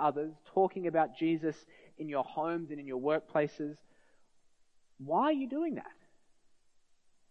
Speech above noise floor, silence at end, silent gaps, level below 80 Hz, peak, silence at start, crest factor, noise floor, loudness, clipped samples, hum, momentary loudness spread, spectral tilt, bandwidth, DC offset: 32 dB; 1.4 s; none; -82 dBFS; -16 dBFS; 0 s; 18 dB; -66 dBFS; -34 LUFS; under 0.1%; none; 12 LU; -7.5 dB/octave; 6.6 kHz; under 0.1%